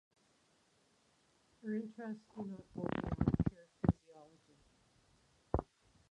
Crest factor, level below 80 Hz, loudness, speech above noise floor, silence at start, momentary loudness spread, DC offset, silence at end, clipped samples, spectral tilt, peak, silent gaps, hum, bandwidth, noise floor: 26 dB; -52 dBFS; -40 LUFS; 31 dB; 1.65 s; 12 LU; under 0.1%; 0.5 s; under 0.1%; -9.5 dB/octave; -16 dBFS; none; none; 10 kHz; -74 dBFS